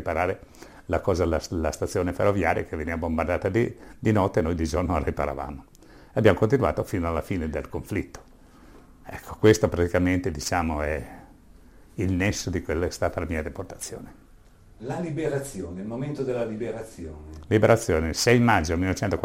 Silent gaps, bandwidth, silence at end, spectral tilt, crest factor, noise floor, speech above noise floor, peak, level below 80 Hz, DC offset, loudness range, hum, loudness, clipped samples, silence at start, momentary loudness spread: none; 16 kHz; 0 s; -6 dB/octave; 20 dB; -52 dBFS; 27 dB; -6 dBFS; -42 dBFS; under 0.1%; 7 LU; none; -25 LUFS; under 0.1%; 0 s; 16 LU